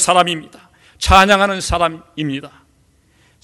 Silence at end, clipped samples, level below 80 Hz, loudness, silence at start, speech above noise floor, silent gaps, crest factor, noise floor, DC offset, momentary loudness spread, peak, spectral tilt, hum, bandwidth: 0.95 s; 0.3%; -30 dBFS; -15 LUFS; 0 s; 40 dB; none; 16 dB; -55 dBFS; under 0.1%; 15 LU; 0 dBFS; -3 dB/octave; none; over 20 kHz